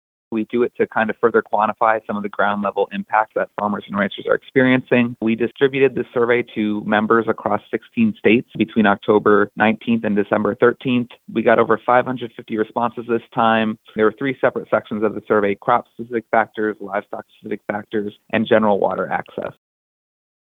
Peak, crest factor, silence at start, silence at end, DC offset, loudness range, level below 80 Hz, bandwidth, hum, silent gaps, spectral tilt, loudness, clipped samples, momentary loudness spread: -2 dBFS; 18 dB; 0.3 s; 1.1 s; under 0.1%; 4 LU; -62 dBFS; 4.1 kHz; none; none; -8.5 dB/octave; -19 LUFS; under 0.1%; 10 LU